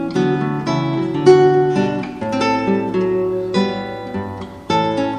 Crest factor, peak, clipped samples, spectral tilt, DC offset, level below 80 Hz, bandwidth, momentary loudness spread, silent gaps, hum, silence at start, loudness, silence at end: 16 dB; 0 dBFS; under 0.1%; -7 dB/octave; under 0.1%; -50 dBFS; 9.6 kHz; 14 LU; none; none; 0 s; -17 LUFS; 0 s